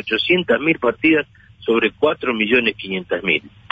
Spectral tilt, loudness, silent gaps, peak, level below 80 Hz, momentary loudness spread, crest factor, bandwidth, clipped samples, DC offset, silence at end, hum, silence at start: -7 dB/octave; -18 LUFS; none; -4 dBFS; -54 dBFS; 7 LU; 14 dB; 5.2 kHz; under 0.1%; under 0.1%; 0.25 s; none; 0.05 s